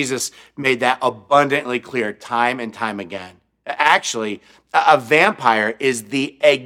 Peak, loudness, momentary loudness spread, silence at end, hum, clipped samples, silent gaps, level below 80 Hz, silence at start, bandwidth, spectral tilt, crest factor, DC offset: 0 dBFS; -18 LUFS; 13 LU; 0 s; none; under 0.1%; none; -66 dBFS; 0 s; 16.5 kHz; -3 dB/octave; 18 dB; under 0.1%